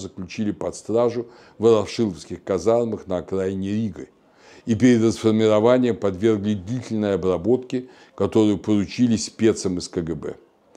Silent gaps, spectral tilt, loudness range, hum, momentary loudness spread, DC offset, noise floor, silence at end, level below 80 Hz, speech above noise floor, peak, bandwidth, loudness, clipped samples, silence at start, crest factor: none; -6.5 dB/octave; 3 LU; none; 13 LU; under 0.1%; -50 dBFS; 0.45 s; -54 dBFS; 29 dB; -4 dBFS; 10.5 kHz; -22 LUFS; under 0.1%; 0 s; 18 dB